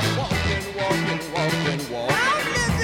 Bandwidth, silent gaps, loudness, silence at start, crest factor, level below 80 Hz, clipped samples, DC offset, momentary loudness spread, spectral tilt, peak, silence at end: 17.5 kHz; none; -23 LUFS; 0 s; 14 dB; -40 dBFS; under 0.1%; under 0.1%; 5 LU; -4.5 dB/octave; -8 dBFS; 0 s